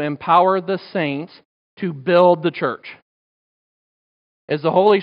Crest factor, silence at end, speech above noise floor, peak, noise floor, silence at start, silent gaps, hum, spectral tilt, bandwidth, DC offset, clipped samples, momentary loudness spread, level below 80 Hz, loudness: 18 dB; 0 s; over 73 dB; -2 dBFS; under -90 dBFS; 0 s; 1.45-1.77 s, 3.02-4.48 s; none; -9 dB/octave; 5.4 kHz; under 0.1%; under 0.1%; 15 LU; -72 dBFS; -18 LUFS